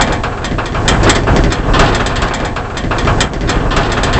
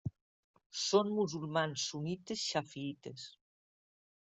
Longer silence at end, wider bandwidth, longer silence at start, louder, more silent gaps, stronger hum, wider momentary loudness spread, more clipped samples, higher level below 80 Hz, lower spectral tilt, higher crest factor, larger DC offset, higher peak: second, 0 s vs 0.9 s; about the same, 8.6 kHz vs 8.2 kHz; about the same, 0 s vs 0.05 s; first, -13 LUFS vs -36 LUFS; second, none vs 0.21-0.54 s, 0.66-0.70 s; neither; second, 7 LU vs 16 LU; neither; first, -18 dBFS vs -74 dBFS; about the same, -4.5 dB/octave vs -4 dB/octave; second, 12 dB vs 22 dB; first, 0.2% vs under 0.1%; first, 0 dBFS vs -16 dBFS